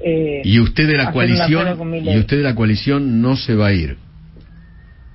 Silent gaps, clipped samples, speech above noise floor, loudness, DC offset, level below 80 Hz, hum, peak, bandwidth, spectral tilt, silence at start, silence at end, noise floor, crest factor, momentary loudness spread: none; under 0.1%; 26 dB; -16 LUFS; under 0.1%; -32 dBFS; none; 0 dBFS; 5.8 kHz; -10.5 dB/octave; 0 s; 0.05 s; -41 dBFS; 16 dB; 6 LU